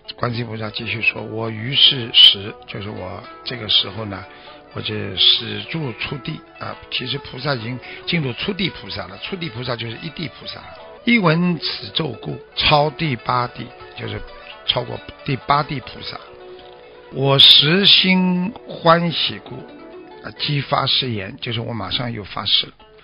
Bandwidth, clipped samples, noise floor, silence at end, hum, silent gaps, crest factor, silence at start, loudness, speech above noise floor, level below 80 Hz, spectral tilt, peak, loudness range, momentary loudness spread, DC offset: 7.4 kHz; under 0.1%; -41 dBFS; 0.35 s; none; none; 20 dB; 0.1 s; -17 LUFS; 22 dB; -50 dBFS; -2 dB/octave; 0 dBFS; 11 LU; 21 LU; under 0.1%